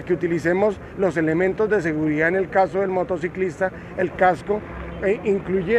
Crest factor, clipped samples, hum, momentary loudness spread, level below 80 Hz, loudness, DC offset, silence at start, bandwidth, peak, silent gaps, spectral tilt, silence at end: 18 dB; under 0.1%; none; 7 LU; -46 dBFS; -22 LUFS; under 0.1%; 0 s; 10 kHz; -4 dBFS; none; -7.5 dB/octave; 0 s